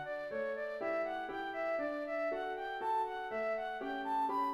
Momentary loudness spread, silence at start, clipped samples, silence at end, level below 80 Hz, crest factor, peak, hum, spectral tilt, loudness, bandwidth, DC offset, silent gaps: 4 LU; 0 s; under 0.1%; 0 s; -70 dBFS; 12 dB; -26 dBFS; none; -5 dB/octave; -38 LUFS; 13.5 kHz; under 0.1%; none